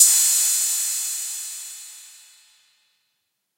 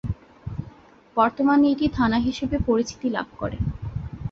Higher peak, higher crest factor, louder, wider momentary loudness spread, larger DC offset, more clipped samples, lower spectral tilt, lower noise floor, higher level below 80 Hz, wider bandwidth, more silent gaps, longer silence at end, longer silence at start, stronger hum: first, 0 dBFS vs -6 dBFS; first, 24 dB vs 18 dB; first, -18 LUFS vs -23 LUFS; first, 22 LU vs 16 LU; neither; neither; second, 8 dB/octave vs -7 dB/octave; first, -75 dBFS vs -48 dBFS; second, -88 dBFS vs -40 dBFS; first, 16 kHz vs 7.6 kHz; neither; first, 1.5 s vs 0 s; about the same, 0 s vs 0.05 s; neither